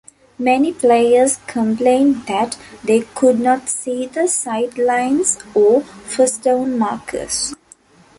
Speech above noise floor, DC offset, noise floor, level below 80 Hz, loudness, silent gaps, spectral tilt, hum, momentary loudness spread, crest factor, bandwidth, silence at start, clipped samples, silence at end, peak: 32 dB; under 0.1%; -48 dBFS; -54 dBFS; -16 LUFS; none; -3.5 dB/octave; none; 8 LU; 14 dB; 11.5 kHz; 0.4 s; under 0.1%; 0.65 s; -2 dBFS